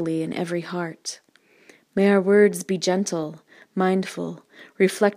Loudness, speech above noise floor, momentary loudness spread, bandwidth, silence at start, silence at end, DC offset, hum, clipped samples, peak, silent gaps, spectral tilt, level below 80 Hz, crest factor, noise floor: -22 LUFS; 32 dB; 16 LU; 15.5 kHz; 0 s; 0 s; under 0.1%; none; under 0.1%; -4 dBFS; none; -5.5 dB/octave; -74 dBFS; 18 dB; -54 dBFS